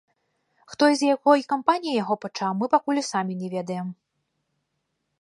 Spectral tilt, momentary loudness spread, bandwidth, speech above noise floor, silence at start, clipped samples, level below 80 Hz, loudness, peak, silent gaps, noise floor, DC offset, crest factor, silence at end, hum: -5 dB/octave; 11 LU; 11.5 kHz; 54 dB; 0.7 s; under 0.1%; -76 dBFS; -23 LUFS; -4 dBFS; none; -77 dBFS; under 0.1%; 22 dB; 1.3 s; none